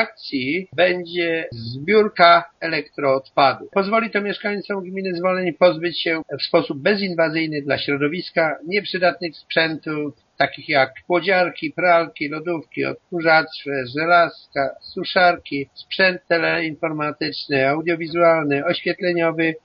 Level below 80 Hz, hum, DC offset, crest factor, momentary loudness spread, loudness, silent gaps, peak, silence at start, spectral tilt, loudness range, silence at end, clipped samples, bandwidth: -64 dBFS; none; under 0.1%; 20 dB; 9 LU; -20 LUFS; none; 0 dBFS; 0 s; -2.5 dB/octave; 3 LU; 0.05 s; under 0.1%; 5.6 kHz